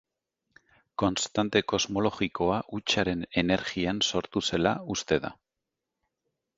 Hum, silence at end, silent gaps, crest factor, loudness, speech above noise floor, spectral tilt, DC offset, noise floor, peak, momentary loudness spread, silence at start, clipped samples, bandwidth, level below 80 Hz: none; 1.25 s; none; 22 dB; -28 LUFS; 59 dB; -4 dB/octave; under 0.1%; -86 dBFS; -8 dBFS; 4 LU; 1 s; under 0.1%; 8 kHz; -54 dBFS